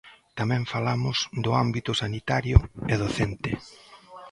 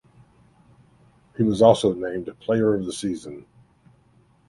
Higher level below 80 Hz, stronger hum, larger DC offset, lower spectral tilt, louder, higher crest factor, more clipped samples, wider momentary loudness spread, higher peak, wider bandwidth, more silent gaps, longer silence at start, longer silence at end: first, -34 dBFS vs -56 dBFS; neither; neither; about the same, -5.5 dB/octave vs -6.5 dB/octave; second, -26 LUFS vs -22 LUFS; about the same, 24 dB vs 22 dB; neither; second, 11 LU vs 22 LU; about the same, -2 dBFS vs -2 dBFS; about the same, 11 kHz vs 11.5 kHz; neither; second, 0.05 s vs 1.4 s; second, 0 s vs 1.1 s